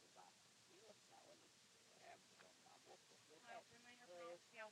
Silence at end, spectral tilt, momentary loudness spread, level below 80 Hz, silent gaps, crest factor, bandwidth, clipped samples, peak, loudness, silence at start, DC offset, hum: 0 s; -2 dB/octave; 10 LU; under -90 dBFS; none; 22 dB; 13 kHz; under 0.1%; -44 dBFS; -64 LUFS; 0 s; under 0.1%; none